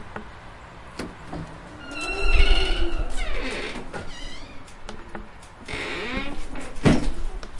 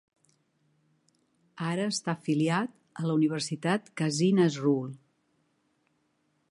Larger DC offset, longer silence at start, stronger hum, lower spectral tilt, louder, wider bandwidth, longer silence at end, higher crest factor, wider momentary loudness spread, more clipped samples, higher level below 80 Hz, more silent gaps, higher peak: neither; second, 0 s vs 1.55 s; neither; about the same, -5 dB/octave vs -5.5 dB/octave; about the same, -28 LUFS vs -29 LUFS; about the same, 11 kHz vs 11.5 kHz; second, 0 s vs 1.55 s; about the same, 20 dB vs 18 dB; first, 20 LU vs 10 LU; neither; first, -28 dBFS vs -78 dBFS; neither; first, -4 dBFS vs -12 dBFS